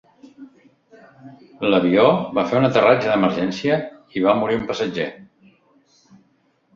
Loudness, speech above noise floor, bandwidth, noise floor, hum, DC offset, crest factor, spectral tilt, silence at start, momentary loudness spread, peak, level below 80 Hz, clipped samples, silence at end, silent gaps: -19 LUFS; 44 dB; 7.4 kHz; -62 dBFS; none; under 0.1%; 20 dB; -6.5 dB/octave; 0.25 s; 9 LU; -2 dBFS; -58 dBFS; under 0.1%; 1.5 s; none